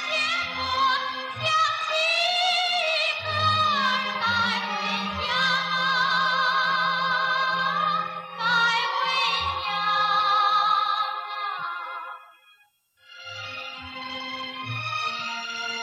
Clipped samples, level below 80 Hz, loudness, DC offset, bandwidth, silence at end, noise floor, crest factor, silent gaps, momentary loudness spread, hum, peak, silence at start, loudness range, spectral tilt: under 0.1%; -60 dBFS; -23 LUFS; under 0.1%; 12.5 kHz; 0 s; -62 dBFS; 14 dB; none; 12 LU; none; -12 dBFS; 0 s; 10 LU; -2.5 dB/octave